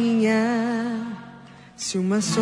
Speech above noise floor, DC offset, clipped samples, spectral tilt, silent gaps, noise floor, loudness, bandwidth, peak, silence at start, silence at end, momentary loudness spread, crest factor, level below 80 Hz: 23 dB; under 0.1%; under 0.1%; -5 dB/octave; none; -45 dBFS; -23 LUFS; 10.5 kHz; -10 dBFS; 0 s; 0 s; 15 LU; 14 dB; -64 dBFS